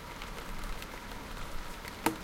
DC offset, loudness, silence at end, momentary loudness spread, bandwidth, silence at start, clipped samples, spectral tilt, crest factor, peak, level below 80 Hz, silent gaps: under 0.1%; -41 LUFS; 0 s; 8 LU; 17 kHz; 0 s; under 0.1%; -3.5 dB/octave; 30 dB; -10 dBFS; -44 dBFS; none